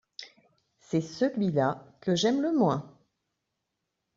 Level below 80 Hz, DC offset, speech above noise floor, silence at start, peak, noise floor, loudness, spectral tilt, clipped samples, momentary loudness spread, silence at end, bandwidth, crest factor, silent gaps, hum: -70 dBFS; under 0.1%; 56 dB; 0.2 s; -12 dBFS; -83 dBFS; -28 LUFS; -5.5 dB/octave; under 0.1%; 10 LU; 1.3 s; 7.8 kHz; 18 dB; none; none